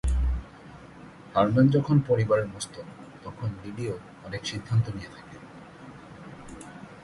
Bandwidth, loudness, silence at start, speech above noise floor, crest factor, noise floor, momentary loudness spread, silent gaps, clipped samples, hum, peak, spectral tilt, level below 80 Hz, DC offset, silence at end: 11.5 kHz; -27 LUFS; 0.05 s; 21 dB; 18 dB; -47 dBFS; 24 LU; none; under 0.1%; none; -10 dBFS; -7 dB/octave; -38 dBFS; under 0.1%; 0 s